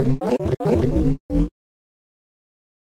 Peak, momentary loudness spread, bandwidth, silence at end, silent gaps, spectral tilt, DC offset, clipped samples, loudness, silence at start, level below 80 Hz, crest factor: -8 dBFS; 5 LU; 13 kHz; 1.35 s; 1.20-1.29 s; -9 dB/octave; under 0.1%; under 0.1%; -21 LUFS; 0 s; -30 dBFS; 14 dB